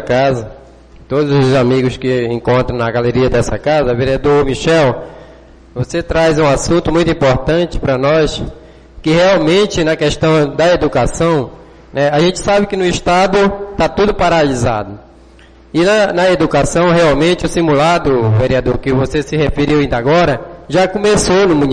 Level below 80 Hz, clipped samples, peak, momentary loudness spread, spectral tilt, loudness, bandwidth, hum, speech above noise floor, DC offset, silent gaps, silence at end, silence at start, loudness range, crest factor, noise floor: -30 dBFS; under 0.1%; -2 dBFS; 7 LU; -5.5 dB/octave; -13 LUFS; 10 kHz; none; 29 dB; under 0.1%; none; 0 s; 0 s; 2 LU; 10 dB; -41 dBFS